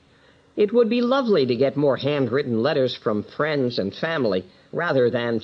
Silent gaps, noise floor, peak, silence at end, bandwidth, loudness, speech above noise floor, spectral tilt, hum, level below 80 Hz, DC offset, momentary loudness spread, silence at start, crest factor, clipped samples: none; -55 dBFS; -8 dBFS; 0 s; 6.4 kHz; -22 LUFS; 34 dB; -7.5 dB/octave; none; -66 dBFS; under 0.1%; 7 LU; 0.55 s; 14 dB; under 0.1%